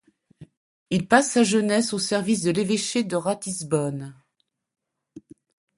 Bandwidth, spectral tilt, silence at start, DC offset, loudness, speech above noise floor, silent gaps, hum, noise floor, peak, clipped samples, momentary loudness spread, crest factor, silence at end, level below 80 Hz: 11.5 kHz; -4 dB/octave; 0.4 s; under 0.1%; -23 LUFS; 52 dB; 0.57-0.86 s; none; -75 dBFS; -2 dBFS; under 0.1%; 9 LU; 22 dB; 0.6 s; -64 dBFS